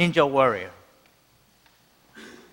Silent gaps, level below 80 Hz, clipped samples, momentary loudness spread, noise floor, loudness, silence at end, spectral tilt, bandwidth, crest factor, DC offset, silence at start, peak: none; -62 dBFS; under 0.1%; 26 LU; -61 dBFS; -22 LUFS; 0.25 s; -6 dB/octave; 16.5 kHz; 22 dB; under 0.1%; 0 s; -4 dBFS